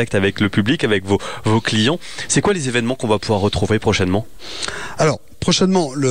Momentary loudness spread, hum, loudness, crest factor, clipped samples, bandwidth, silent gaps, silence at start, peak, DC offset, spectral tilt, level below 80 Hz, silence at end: 7 LU; none; -18 LUFS; 14 dB; under 0.1%; 15.5 kHz; none; 0 s; -4 dBFS; 2%; -4.5 dB/octave; -44 dBFS; 0 s